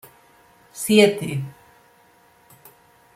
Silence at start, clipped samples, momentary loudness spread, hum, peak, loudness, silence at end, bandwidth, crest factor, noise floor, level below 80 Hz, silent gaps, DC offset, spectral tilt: 0.75 s; under 0.1%; 21 LU; none; -2 dBFS; -19 LUFS; 1.65 s; 16 kHz; 22 dB; -55 dBFS; -66 dBFS; none; under 0.1%; -4.5 dB/octave